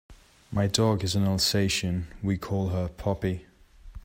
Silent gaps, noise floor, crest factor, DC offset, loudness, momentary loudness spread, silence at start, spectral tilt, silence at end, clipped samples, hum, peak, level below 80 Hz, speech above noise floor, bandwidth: none; -46 dBFS; 20 dB; under 0.1%; -27 LUFS; 8 LU; 0.1 s; -5 dB/octave; 0 s; under 0.1%; none; -8 dBFS; -48 dBFS; 19 dB; 16 kHz